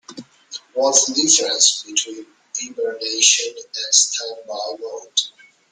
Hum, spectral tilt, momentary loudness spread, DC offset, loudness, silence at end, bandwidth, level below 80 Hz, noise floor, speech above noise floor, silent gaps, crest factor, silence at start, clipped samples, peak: none; 1 dB/octave; 16 LU; under 0.1%; -17 LUFS; 0.4 s; 12 kHz; -74 dBFS; -40 dBFS; 20 dB; none; 20 dB; 0.1 s; under 0.1%; 0 dBFS